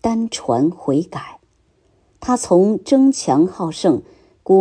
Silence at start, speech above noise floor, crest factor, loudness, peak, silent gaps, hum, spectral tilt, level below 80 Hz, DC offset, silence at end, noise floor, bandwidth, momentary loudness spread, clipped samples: 0.05 s; 42 dB; 14 dB; -17 LUFS; -2 dBFS; none; none; -6 dB/octave; -52 dBFS; under 0.1%; 0 s; -59 dBFS; 10.5 kHz; 15 LU; under 0.1%